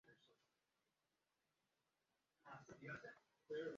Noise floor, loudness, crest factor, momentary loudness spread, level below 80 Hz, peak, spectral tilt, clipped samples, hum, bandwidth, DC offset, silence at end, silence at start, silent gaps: under -90 dBFS; -56 LUFS; 20 dB; 10 LU; under -90 dBFS; -40 dBFS; -4.5 dB/octave; under 0.1%; none; 7.4 kHz; under 0.1%; 0 s; 0.05 s; none